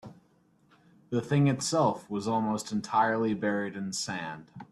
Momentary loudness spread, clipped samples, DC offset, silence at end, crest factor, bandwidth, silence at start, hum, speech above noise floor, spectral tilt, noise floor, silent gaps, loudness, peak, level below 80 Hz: 9 LU; under 0.1%; under 0.1%; 0.1 s; 18 dB; 12.5 kHz; 0.05 s; none; 36 dB; -5.5 dB/octave; -65 dBFS; none; -29 LUFS; -12 dBFS; -70 dBFS